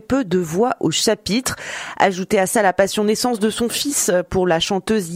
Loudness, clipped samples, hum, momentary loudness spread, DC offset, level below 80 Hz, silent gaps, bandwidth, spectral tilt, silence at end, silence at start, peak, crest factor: -18 LUFS; under 0.1%; none; 4 LU; under 0.1%; -46 dBFS; none; 16 kHz; -3.5 dB/octave; 0 s; 0.1 s; 0 dBFS; 18 dB